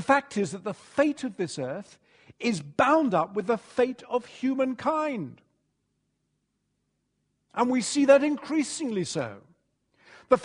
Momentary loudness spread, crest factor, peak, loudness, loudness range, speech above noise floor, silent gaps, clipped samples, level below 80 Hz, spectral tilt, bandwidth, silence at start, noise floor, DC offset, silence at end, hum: 13 LU; 22 dB; -6 dBFS; -27 LUFS; 6 LU; 51 dB; none; under 0.1%; -70 dBFS; -4.5 dB/octave; 10.5 kHz; 0 s; -77 dBFS; under 0.1%; 0 s; none